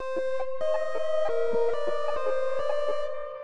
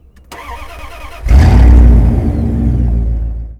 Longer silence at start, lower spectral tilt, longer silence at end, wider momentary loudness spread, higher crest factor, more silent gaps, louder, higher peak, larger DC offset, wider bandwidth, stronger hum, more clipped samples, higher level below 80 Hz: second, 0 s vs 0.3 s; second, -4.5 dB/octave vs -8.5 dB/octave; about the same, 0 s vs 0.05 s; second, 4 LU vs 23 LU; about the same, 12 dB vs 10 dB; neither; second, -29 LUFS vs -10 LUFS; second, -14 dBFS vs 0 dBFS; first, 4% vs under 0.1%; first, 10.5 kHz vs 6.8 kHz; neither; second, under 0.1% vs 4%; second, -60 dBFS vs -10 dBFS